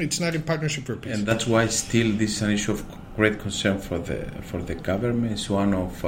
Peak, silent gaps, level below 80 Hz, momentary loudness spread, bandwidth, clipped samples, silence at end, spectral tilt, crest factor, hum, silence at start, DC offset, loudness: -4 dBFS; none; -42 dBFS; 10 LU; 16.5 kHz; under 0.1%; 0 s; -4.5 dB/octave; 20 dB; none; 0 s; under 0.1%; -25 LUFS